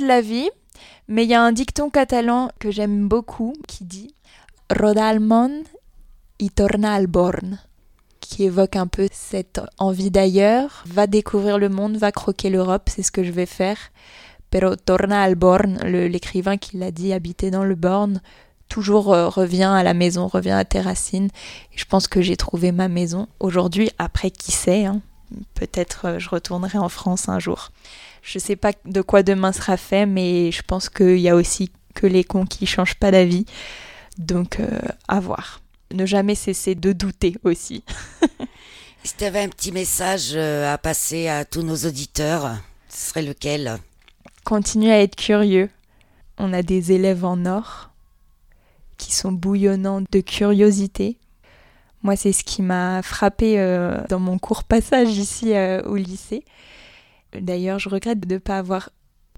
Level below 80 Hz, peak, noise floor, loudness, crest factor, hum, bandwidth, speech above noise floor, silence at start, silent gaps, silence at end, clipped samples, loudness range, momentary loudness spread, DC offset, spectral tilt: -38 dBFS; 0 dBFS; -54 dBFS; -20 LUFS; 18 dB; none; 16.5 kHz; 35 dB; 0 s; none; 0.5 s; under 0.1%; 5 LU; 14 LU; under 0.1%; -5 dB/octave